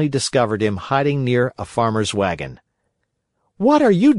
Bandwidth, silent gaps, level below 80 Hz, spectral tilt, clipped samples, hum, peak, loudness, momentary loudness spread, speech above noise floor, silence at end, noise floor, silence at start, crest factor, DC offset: 11 kHz; none; -50 dBFS; -6 dB/octave; under 0.1%; none; -2 dBFS; -19 LUFS; 8 LU; 56 dB; 0 s; -73 dBFS; 0 s; 16 dB; under 0.1%